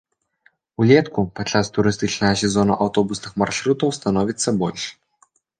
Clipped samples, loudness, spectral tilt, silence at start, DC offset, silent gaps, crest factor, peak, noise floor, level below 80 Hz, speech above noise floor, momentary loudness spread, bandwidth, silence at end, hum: under 0.1%; -20 LUFS; -5 dB/octave; 0.8 s; under 0.1%; none; 18 dB; -2 dBFS; -61 dBFS; -48 dBFS; 42 dB; 9 LU; 10 kHz; 0.65 s; none